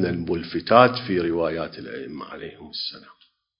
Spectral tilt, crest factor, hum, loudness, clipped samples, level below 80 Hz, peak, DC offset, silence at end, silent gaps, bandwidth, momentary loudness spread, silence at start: -10 dB/octave; 24 dB; none; -22 LUFS; under 0.1%; -52 dBFS; 0 dBFS; under 0.1%; 0.6 s; none; 5.4 kHz; 19 LU; 0 s